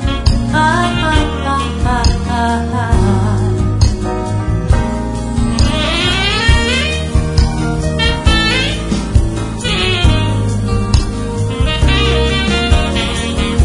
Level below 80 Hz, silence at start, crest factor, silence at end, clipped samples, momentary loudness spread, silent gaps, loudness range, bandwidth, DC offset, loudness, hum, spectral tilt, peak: -18 dBFS; 0 s; 12 dB; 0 s; under 0.1%; 5 LU; none; 2 LU; 11 kHz; under 0.1%; -14 LUFS; none; -5 dB/octave; 0 dBFS